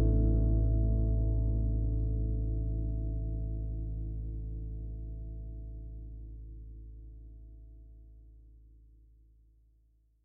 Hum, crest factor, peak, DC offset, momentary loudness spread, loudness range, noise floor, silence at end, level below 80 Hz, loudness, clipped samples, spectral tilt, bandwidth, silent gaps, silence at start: none; 16 dB; -18 dBFS; under 0.1%; 23 LU; 22 LU; -67 dBFS; 1.65 s; -34 dBFS; -34 LUFS; under 0.1%; -14 dB/octave; 1.1 kHz; none; 0 s